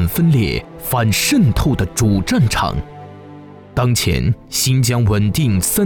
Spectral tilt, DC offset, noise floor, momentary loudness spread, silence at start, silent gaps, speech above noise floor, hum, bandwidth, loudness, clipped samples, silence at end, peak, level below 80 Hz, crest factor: -5 dB/octave; under 0.1%; -37 dBFS; 9 LU; 0 s; none; 22 dB; none; over 20 kHz; -16 LUFS; under 0.1%; 0 s; -6 dBFS; -30 dBFS; 10 dB